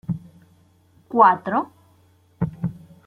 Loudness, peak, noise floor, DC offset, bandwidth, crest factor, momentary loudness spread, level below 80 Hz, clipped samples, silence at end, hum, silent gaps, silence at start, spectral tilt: -21 LUFS; -2 dBFS; -57 dBFS; under 0.1%; 5.2 kHz; 22 dB; 16 LU; -54 dBFS; under 0.1%; 0.35 s; none; none; 0.1 s; -9 dB/octave